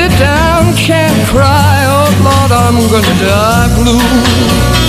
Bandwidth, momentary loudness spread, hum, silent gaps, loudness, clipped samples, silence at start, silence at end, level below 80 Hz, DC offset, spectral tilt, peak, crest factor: 15.5 kHz; 1 LU; none; none; -8 LUFS; 0.2%; 0 s; 0 s; -20 dBFS; under 0.1%; -5 dB/octave; 0 dBFS; 8 dB